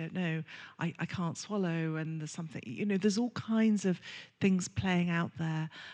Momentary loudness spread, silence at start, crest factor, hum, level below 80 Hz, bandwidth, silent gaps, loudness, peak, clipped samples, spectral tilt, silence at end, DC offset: 10 LU; 0 s; 16 dB; none; -66 dBFS; 9.6 kHz; none; -33 LUFS; -16 dBFS; under 0.1%; -6 dB/octave; 0 s; under 0.1%